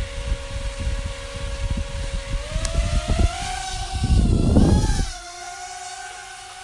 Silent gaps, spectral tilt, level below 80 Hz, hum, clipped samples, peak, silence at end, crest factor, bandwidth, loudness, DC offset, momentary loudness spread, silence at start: none; -5.5 dB/octave; -26 dBFS; none; under 0.1%; -4 dBFS; 0 s; 18 dB; 11.5 kHz; -25 LUFS; under 0.1%; 15 LU; 0 s